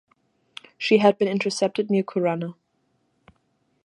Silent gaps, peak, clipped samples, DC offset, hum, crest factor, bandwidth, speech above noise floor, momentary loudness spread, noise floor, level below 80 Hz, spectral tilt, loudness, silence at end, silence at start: none; -4 dBFS; under 0.1%; under 0.1%; none; 22 dB; 11 kHz; 48 dB; 24 LU; -70 dBFS; -72 dBFS; -5.5 dB/octave; -22 LUFS; 1.3 s; 0.8 s